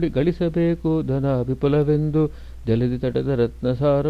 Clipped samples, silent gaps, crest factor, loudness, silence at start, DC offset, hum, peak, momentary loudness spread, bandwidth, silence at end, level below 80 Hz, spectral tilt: under 0.1%; none; 14 dB; -21 LUFS; 0 s; under 0.1%; none; -6 dBFS; 3 LU; 6 kHz; 0 s; -38 dBFS; -10 dB/octave